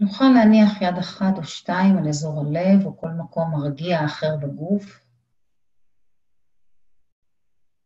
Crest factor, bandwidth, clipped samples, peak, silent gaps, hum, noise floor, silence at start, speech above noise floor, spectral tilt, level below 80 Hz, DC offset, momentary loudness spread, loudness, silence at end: 16 dB; 7.8 kHz; under 0.1%; -4 dBFS; none; none; -73 dBFS; 0 s; 54 dB; -7 dB/octave; -60 dBFS; under 0.1%; 12 LU; -20 LUFS; 2.95 s